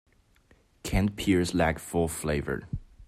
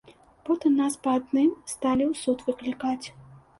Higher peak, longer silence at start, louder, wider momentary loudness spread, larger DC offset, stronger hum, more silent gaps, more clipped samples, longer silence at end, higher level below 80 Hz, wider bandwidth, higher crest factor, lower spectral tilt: about the same, -12 dBFS vs -12 dBFS; first, 0.85 s vs 0.1 s; about the same, -28 LUFS vs -26 LUFS; about the same, 10 LU vs 8 LU; neither; neither; neither; neither; second, 0.05 s vs 0.2 s; first, -42 dBFS vs -60 dBFS; first, 16 kHz vs 11.5 kHz; about the same, 18 dB vs 14 dB; about the same, -5.5 dB/octave vs -4.5 dB/octave